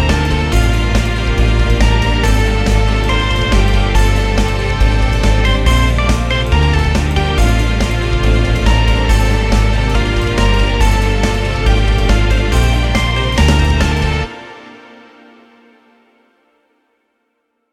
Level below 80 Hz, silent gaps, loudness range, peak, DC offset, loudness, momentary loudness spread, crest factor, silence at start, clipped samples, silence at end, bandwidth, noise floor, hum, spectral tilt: -14 dBFS; none; 3 LU; 0 dBFS; under 0.1%; -14 LUFS; 3 LU; 12 dB; 0 s; under 0.1%; 2.95 s; 13 kHz; -66 dBFS; none; -5.5 dB/octave